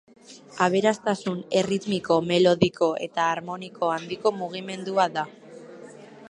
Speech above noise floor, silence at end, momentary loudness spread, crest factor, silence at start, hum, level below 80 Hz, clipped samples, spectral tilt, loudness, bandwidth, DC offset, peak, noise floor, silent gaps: 20 dB; 0 s; 19 LU; 22 dB; 0.3 s; none; -64 dBFS; under 0.1%; -5 dB/octave; -24 LUFS; 10.5 kHz; under 0.1%; -4 dBFS; -45 dBFS; none